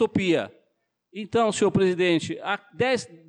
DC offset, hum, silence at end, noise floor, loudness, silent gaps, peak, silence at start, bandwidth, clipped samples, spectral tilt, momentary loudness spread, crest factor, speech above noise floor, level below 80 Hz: under 0.1%; none; 0.1 s; -73 dBFS; -24 LUFS; none; -12 dBFS; 0 s; 10.5 kHz; under 0.1%; -5 dB/octave; 13 LU; 12 dB; 49 dB; -60 dBFS